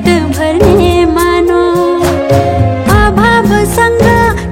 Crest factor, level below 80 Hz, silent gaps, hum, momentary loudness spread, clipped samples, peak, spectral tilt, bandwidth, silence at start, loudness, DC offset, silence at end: 8 dB; -20 dBFS; none; none; 4 LU; 2%; 0 dBFS; -6 dB/octave; 17 kHz; 0 s; -9 LUFS; under 0.1%; 0 s